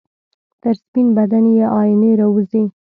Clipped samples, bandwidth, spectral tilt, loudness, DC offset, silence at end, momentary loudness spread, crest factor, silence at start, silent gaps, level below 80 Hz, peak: under 0.1%; 4.4 kHz; -12 dB/octave; -14 LUFS; under 0.1%; 0.2 s; 8 LU; 10 dB; 0.65 s; 0.88-0.93 s; -62 dBFS; -4 dBFS